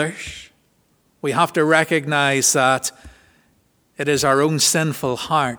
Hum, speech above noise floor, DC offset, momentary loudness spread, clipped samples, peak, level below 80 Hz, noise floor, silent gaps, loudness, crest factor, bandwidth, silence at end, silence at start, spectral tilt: none; 43 dB; under 0.1%; 12 LU; under 0.1%; 0 dBFS; -54 dBFS; -62 dBFS; none; -18 LUFS; 20 dB; over 20 kHz; 0 s; 0 s; -3 dB/octave